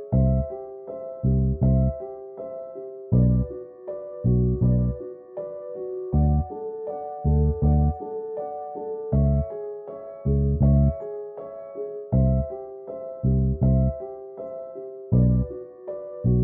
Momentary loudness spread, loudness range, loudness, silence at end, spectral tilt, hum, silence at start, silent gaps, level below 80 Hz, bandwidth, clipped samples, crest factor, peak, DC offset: 15 LU; 1 LU; -25 LUFS; 0 s; -16 dB/octave; none; 0 s; none; -30 dBFS; 2.1 kHz; under 0.1%; 16 dB; -8 dBFS; under 0.1%